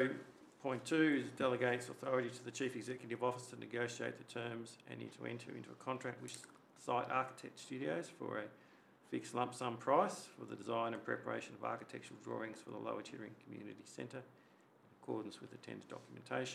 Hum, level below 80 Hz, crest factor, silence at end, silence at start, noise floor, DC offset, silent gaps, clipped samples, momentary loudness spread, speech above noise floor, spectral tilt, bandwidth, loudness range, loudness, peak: none; under -90 dBFS; 24 dB; 0 s; 0 s; -68 dBFS; under 0.1%; none; under 0.1%; 17 LU; 26 dB; -5 dB/octave; 14 kHz; 10 LU; -42 LUFS; -20 dBFS